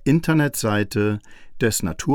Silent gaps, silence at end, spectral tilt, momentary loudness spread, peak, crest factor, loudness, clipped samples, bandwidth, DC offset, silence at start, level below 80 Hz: none; 0 s; -5.5 dB/octave; 6 LU; -6 dBFS; 16 dB; -21 LUFS; under 0.1%; 19 kHz; under 0.1%; 0 s; -44 dBFS